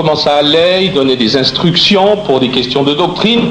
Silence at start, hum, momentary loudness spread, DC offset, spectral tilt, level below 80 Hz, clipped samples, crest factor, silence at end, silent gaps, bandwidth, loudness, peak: 0 s; none; 4 LU; under 0.1%; -5.5 dB/octave; -42 dBFS; under 0.1%; 10 dB; 0 s; none; 10 kHz; -10 LUFS; 0 dBFS